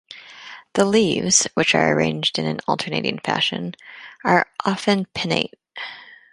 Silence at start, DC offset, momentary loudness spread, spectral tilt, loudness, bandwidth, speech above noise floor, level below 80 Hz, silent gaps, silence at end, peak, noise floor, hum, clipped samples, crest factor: 0.1 s; under 0.1%; 21 LU; -3 dB/octave; -20 LUFS; 11.5 kHz; 21 dB; -58 dBFS; none; 0.2 s; 0 dBFS; -41 dBFS; none; under 0.1%; 22 dB